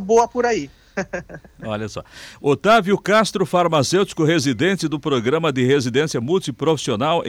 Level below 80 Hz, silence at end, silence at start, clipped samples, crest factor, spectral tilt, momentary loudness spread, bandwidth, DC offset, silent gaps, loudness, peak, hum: -52 dBFS; 0 s; 0 s; under 0.1%; 12 dB; -5 dB/octave; 13 LU; 16.5 kHz; under 0.1%; none; -19 LUFS; -6 dBFS; none